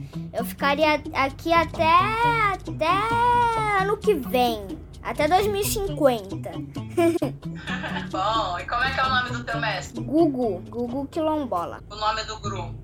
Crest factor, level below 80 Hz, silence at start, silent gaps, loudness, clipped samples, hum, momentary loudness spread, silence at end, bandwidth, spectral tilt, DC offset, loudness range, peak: 18 dB; -44 dBFS; 0 s; none; -23 LUFS; under 0.1%; none; 11 LU; 0 s; 19 kHz; -5 dB/octave; under 0.1%; 5 LU; -6 dBFS